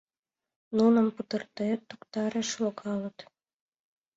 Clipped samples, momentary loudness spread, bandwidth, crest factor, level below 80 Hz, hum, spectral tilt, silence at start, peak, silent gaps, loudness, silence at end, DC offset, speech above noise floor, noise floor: under 0.1%; 12 LU; 7.8 kHz; 18 dB; -74 dBFS; none; -5 dB/octave; 0.7 s; -12 dBFS; none; -29 LUFS; 0.95 s; under 0.1%; over 61 dB; under -90 dBFS